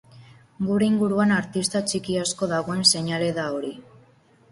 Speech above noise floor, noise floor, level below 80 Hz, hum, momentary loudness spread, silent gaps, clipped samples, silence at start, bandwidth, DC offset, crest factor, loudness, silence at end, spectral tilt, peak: 33 dB; -56 dBFS; -60 dBFS; none; 10 LU; none; under 0.1%; 0.15 s; 11.5 kHz; under 0.1%; 20 dB; -23 LUFS; 0.7 s; -4 dB/octave; -4 dBFS